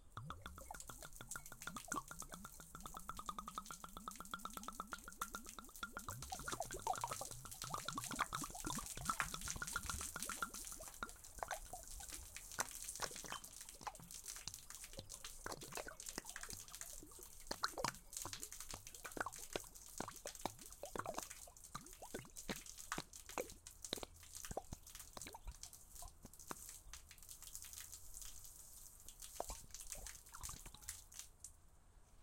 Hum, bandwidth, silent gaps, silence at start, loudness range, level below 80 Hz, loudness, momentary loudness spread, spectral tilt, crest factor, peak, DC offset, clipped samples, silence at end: none; 17 kHz; none; 0 s; 8 LU; -62 dBFS; -49 LUFS; 10 LU; -2 dB/octave; 32 dB; -20 dBFS; under 0.1%; under 0.1%; 0 s